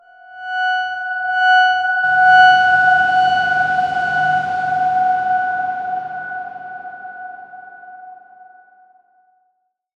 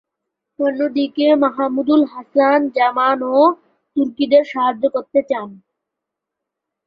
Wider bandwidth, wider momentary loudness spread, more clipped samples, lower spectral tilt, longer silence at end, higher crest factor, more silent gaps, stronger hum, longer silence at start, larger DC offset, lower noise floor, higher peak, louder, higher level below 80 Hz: first, 7.8 kHz vs 5.4 kHz; first, 21 LU vs 7 LU; neither; second, -3 dB/octave vs -6.5 dB/octave; first, 1.85 s vs 1.3 s; about the same, 16 dB vs 16 dB; neither; neither; second, 0.3 s vs 0.6 s; neither; second, -67 dBFS vs -82 dBFS; about the same, -2 dBFS vs -2 dBFS; about the same, -15 LUFS vs -17 LUFS; first, -60 dBFS vs -66 dBFS